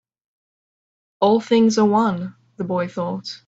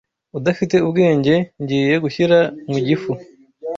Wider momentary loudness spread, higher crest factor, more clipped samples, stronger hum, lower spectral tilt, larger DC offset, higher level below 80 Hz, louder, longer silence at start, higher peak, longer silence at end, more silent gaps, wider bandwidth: about the same, 13 LU vs 11 LU; about the same, 18 dB vs 14 dB; neither; neither; about the same, -6 dB/octave vs -7 dB/octave; neither; second, -64 dBFS vs -56 dBFS; about the same, -19 LUFS vs -17 LUFS; first, 1.2 s vs 0.35 s; about the same, -4 dBFS vs -2 dBFS; about the same, 0.1 s vs 0 s; neither; about the same, 8 kHz vs 7.6 kHz